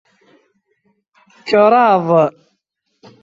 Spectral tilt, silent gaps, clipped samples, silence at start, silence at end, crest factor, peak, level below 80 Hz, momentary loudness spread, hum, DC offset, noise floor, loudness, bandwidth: -7 dB/octave; none; under 0.1%; 1.45 s; 0.9 s; 16 dB; -2 dBFS; -64 dBFS; 9 LU; none; under 0.1%; -69 dBFS; -13 LUFS; 7.6 kHz